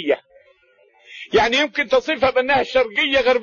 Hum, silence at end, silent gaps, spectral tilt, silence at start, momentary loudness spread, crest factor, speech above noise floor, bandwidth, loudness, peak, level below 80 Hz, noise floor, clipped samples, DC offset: none; 0 s; none; -3.5 dB/octave; 0 s; 6 LU; 16 dB; 39 dB; 7.4 kHz; -18 LUFS; -4 dBFS; -48 dBFS; -56 dBFS; under 0.1%; under 0.1%